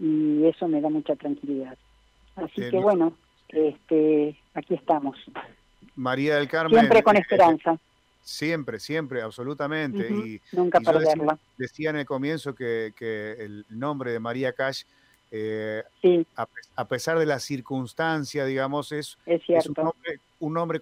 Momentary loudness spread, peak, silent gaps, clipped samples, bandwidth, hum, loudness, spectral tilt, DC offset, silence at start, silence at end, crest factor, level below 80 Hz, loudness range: 14 LU; -8 dBFS; none; under 0.1%; 15.5 kHz; none; -25 LUFS; -6 dB/octave; under 0.1%; 0 s; 0 s; 16 dB; -64 dBFS; 8 LU